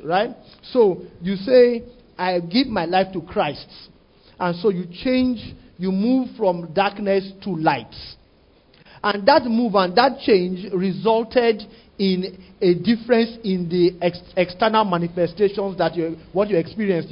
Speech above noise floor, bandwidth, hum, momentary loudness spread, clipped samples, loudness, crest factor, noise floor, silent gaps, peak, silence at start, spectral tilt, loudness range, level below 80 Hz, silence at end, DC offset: 35 dB; 5.4 kHz; none; 11 LU; under 0.1%; -20 LUFS; 20 dB; -55 dBFS; none; 0 dBFS; 0 s; -10.5 dB/octave; 4 LU; -52 dBFS; 0 s; under 0.1%